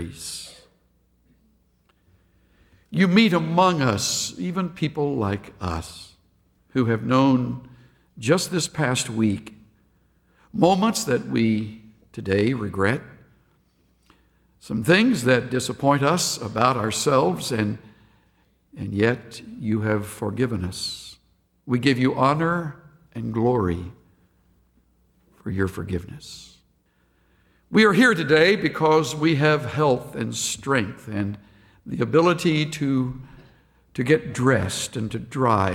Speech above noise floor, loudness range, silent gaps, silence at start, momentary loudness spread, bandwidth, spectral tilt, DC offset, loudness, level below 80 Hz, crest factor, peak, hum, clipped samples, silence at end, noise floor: 43 dB; 7 LU; none; 0 s; 15 LU; 17 kHz; -5 dB/octave; under 0.1%; -22 LUFS; -52 dBFS; 20 dB; -4 dBFS; none; under 0.1%; 0 s; -64 dBFS